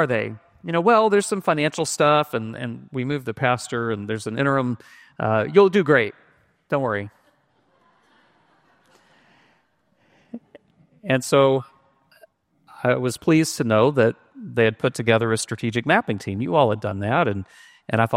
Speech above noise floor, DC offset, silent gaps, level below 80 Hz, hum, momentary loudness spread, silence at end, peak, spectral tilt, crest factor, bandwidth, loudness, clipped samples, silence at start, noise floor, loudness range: 44 dB; under 0.1%; none; -62 dBFS; none; 15 LU; 0 s; -2 dBFS; -5.5 dB/octave; 20 dB; 16 kHz; -21 LUFS; under 0.1%; 0 s; -65 dBFS; 6 LU